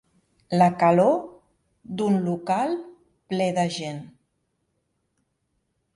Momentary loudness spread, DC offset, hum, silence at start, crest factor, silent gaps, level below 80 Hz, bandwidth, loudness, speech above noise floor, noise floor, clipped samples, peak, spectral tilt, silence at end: 16 LU; under 0.1%; none; 0.5 s; 20 dB; none; -66 dBFS; 11.5 kHz; -23 LUFS; 52 dB; -74 dBFS; under 0.1%; -6 dBFS; -6.5 dB/octave; 1.9 s